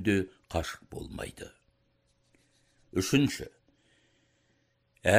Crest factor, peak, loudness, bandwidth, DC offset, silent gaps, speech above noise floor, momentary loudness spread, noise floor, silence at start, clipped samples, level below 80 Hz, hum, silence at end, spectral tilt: 24 dB; -8 dBFS; -32 LUFS; 16 kHz; under 0.1%; none; 41 dB; 18 LU; -72 dBFS; 0 s; under 0.1%; -54 dBFS; none; 0 s; -5 dB/octave